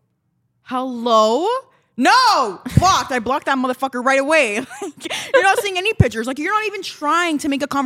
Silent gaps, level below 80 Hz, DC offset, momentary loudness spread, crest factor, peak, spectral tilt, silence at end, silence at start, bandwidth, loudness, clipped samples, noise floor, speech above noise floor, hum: none; -40 dBFS; under 0.1%; 11 LU; 18 dB; 0 dBFS; -4.5 dB/octave; 0 s; 0.7 s; 16.5 kHz; -17 LUFS; under 0.1%; -67 dBFS; 50 dB; none